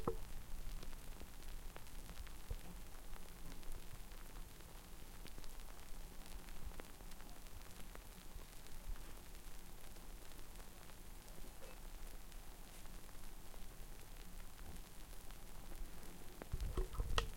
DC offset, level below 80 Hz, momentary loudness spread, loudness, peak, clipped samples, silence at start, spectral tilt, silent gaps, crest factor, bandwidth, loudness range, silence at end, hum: under 0.1%; -50 dBFS; 5 LU; -55 LUFS; -20 dBFS; under 0.1%; 0 s; -4 dB/octave; none; 28 dB; 17 kHz; 3 LU; 0 s; none